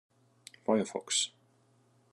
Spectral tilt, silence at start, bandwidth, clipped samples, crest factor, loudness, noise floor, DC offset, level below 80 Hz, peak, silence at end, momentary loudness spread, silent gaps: -2.5 dB/octave; 0.7 s; 12.5 kHz; under 0.1%; 22 dB; -32 LUFS; -68 dBFS; under 0.1%; -90 dBFS; -16 dBFS; 0.85 s; 9 LU; none